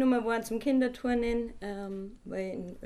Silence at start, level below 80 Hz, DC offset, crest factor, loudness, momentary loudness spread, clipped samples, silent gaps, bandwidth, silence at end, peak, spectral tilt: 0 s; -50 dBFS; under 0.1%; 14 dB; -32 LUFS; 11 LU; under 0.1%; none; 15 kHz; 0 s; -16 dBFS; -6 dB/octave